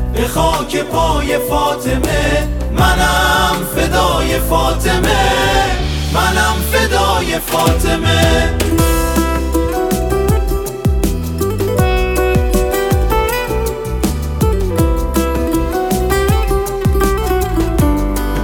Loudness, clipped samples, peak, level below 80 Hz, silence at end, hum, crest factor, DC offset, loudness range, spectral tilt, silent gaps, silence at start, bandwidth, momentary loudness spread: -14 LUFS; under 0.1%; 0 dBFS; -18 dBFS; 0 s; none; 14 dB; under 0.1%; 2 LU; -5 dB/octave; none; 0 s; 17.5 kHz; 5 LU